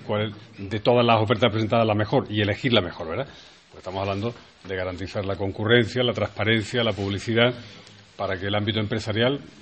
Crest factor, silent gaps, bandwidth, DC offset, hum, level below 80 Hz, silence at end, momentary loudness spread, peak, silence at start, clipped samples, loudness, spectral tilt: 22 dB; none; 8.4 kHz; under 0.1%; none; -56 dBFS; 0 s; 13 LU; -2 dBFS; 0 s; under 0.1%; -24 LUFS; -6 dB/octave